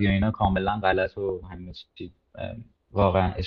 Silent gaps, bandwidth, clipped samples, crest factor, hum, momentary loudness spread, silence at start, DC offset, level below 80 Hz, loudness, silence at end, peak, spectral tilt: none; 5.4 kHz; under 0.1%; 20 dB; none; 19 LU; 0 s; under 0.1%; -40 dBFS; -25 LUFS; 0 s; -6 dBFS; -9 dB/octave